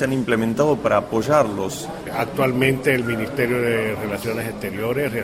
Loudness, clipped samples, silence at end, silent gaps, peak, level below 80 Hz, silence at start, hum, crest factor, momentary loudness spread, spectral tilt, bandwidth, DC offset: -21 LUFS; under 0.1%; 0 s; none; -2 dBFS; -48 dBFS; 0 s; none; 18 dB; 8 LU; -6 dB/octave; 16 kHz; under 0.1%